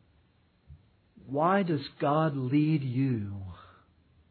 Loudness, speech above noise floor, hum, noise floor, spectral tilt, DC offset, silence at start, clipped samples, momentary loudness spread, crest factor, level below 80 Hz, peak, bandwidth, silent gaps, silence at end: -29 LUFS; 38 dB; none; -66 dBFS; -11.5 dB/octave; under 0.1%; 0.7 s; under 0.1%; 12 LU; 16 dB; -66 dBFS; -14 dBFS; 4.6 kHz; none; 0.7 s